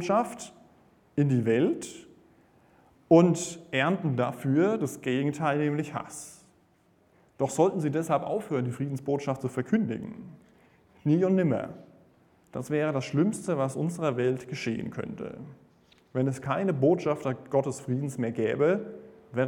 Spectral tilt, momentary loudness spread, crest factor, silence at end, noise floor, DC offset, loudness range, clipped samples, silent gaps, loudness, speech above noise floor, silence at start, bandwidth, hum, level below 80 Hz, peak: -6.5 dB/octave; 16 LU; 22 dB; 0 s; -64 dBFS; under 0.1%; 4 LU; under 0.1%; none; -28 LUFS; 37 dB; 0 s; 17 kHz; none; -68 dBFS; -6 dBFS